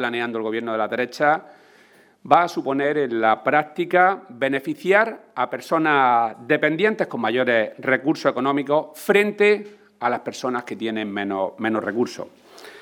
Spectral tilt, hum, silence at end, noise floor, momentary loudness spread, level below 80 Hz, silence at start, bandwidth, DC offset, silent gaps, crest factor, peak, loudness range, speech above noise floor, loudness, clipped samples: -5.5 dB/octave; none; 0 s; -53 dBFS; 9 LU; -76 dBFS; 0 s; 19 kHz; under 0.1%; none; 22 dB; 0 dBFS; 3 LU; 32 dB; -21 LUFS; under 0.1%